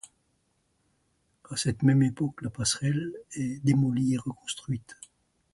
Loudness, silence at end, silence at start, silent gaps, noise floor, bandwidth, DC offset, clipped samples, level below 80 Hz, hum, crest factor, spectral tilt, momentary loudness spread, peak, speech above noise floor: -28 LUFS; 0.6 s; 1.5 s; none; -73 dBFS; 11.5 kHz; under 0.1%; under 0.1%; -58 dBFS; none; 20 dB; -5 dB/octave; 12 LU; -10 dBFS; 45 dB